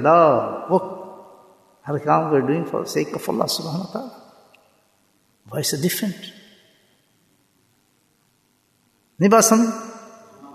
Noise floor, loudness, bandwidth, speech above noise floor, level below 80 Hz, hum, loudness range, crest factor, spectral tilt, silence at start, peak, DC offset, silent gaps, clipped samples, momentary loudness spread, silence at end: -64 dBFS; -20 LUFS; 14 kHz; 45 dB; -68 dBFS; none; 7 LU; 20 dB; -4.5 dB/octave; 0 s; -2 dBFS; under 0.1%; none; under 0.1%; 23 LU; 0 s